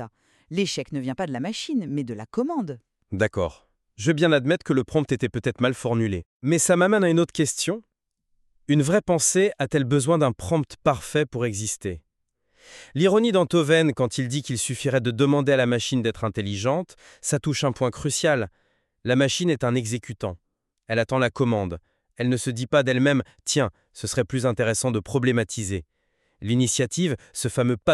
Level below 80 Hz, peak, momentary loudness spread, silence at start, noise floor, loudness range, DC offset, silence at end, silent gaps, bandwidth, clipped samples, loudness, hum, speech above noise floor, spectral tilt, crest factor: -56 dBFS; -4 dBFS; 11 LU; 0 s; -72 dBFS; 4 LU; under 0.1%; 0 s; 6.25-6.40 s; 13 kHz; under 0.1%; -23 LUFS; none; 49 dB; -5 dB/octave; 18 dB